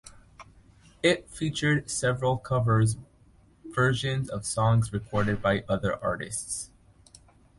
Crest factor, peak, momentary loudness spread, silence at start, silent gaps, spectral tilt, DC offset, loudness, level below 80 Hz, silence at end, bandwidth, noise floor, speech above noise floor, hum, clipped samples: 18 dB; -10 dBFS; 8 LU; 0.05 s; none; -5 dB/octave; under 0.1%; -27 LUFS; -50 dBFS; 0.95 s; 11.5 kHz; -58 dBFS; 32 dB; none; under 0.1%